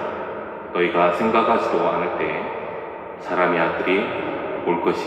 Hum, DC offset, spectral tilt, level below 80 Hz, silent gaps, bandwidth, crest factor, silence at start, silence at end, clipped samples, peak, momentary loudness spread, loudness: none; under 0.1%; -6.5 dB/octave; -60 dBFS; none; 9.4 kHz; 18 dB; 0 s; 0 s; under 0.1%; -4 dBFS; 13 LU; -21 LUFS